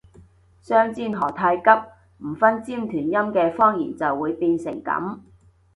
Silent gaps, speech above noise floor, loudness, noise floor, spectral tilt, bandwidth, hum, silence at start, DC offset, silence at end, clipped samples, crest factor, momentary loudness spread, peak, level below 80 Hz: none; 31 dB; -21 LUFS; -52 dBFS; -7.5 dB/octave; 11.5 kHz; none; 0.2 s; under 0.1%; 0.55 s; under 0.1%; 22 dB; 10 LU; 0 dBFS; -58 dBFS